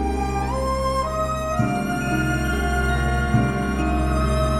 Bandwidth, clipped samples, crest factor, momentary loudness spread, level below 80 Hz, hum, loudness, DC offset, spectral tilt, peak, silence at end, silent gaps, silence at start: 13.5 kHz; under 0.1%; 14 dB; 3 LU; -26 dBFS; none; -22 LUFS; under 0.1%; -6 dB/octave; -8 dBFS; 0 s; none; 0 s